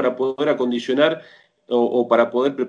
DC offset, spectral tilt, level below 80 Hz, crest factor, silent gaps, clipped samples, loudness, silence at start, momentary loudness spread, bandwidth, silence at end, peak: under 0.1%; -6 dB/octave; -72 dBFS; 18 dB; none; under 0.1%; -19 LUFS; 0 s; 4 LU; 9.6 kHz; 0 s; -2 dBFS